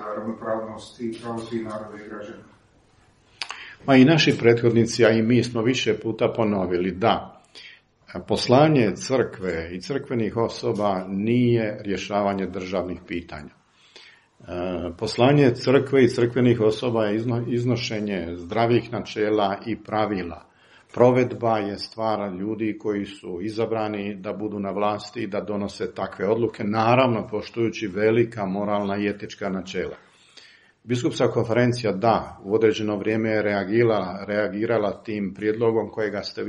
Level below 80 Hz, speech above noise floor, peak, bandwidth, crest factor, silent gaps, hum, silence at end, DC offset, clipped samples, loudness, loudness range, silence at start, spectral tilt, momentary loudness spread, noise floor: -56 dBFS; 35 dB; -2 dBFS; 11.5 kHz; 22 dB; none; none; 0 s; under 0.1%; under 0.1%; -23 LUFS; 7 LU; 0 s; -6.5 dB/octave; 14 LU; -58 dBFS